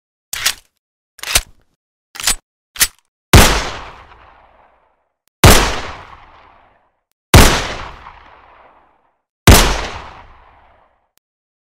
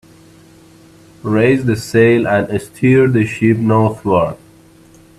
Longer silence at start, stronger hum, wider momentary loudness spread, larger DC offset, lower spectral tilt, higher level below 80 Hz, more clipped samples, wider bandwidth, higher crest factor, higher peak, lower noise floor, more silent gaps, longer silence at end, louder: second, 0.35 s vs 1.25 s; neither; first, 23 LU vs 9 LU; neither; second, -3.5 dB/octave vs -7.5 dB/octave; first, -22 dBFS vs -48 dBFS; first, 0.2% vs under 0.1%; first, 17 kHz vs 13.5 kHz; about the same, 16 dB vs 14 dB; about the same, 0 dBFS vs 0 dBFS; first, -61 dBFS vs -44 dBFS; first, 0.79-1.18 s, 1.76-2.14 s, 2.43-2.74 s, 3.08-3.33 s, 5.28-5.43 s, 7.12-7.33 s, 9.29-9.46 s vs none; first, 1.55 s vs 0.85 s; about the same, -12 LUFS vs -14 LUFS